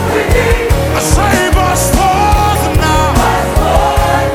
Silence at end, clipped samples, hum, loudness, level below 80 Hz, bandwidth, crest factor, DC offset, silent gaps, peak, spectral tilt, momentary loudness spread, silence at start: 0 s; 0.2%; none; -11 LUFS; -16 dBFS; 18.5 kHz; 10 dB; under 0.1%; none; 0 dBFS; -4.5 dB/octave; 2 LU; 0 s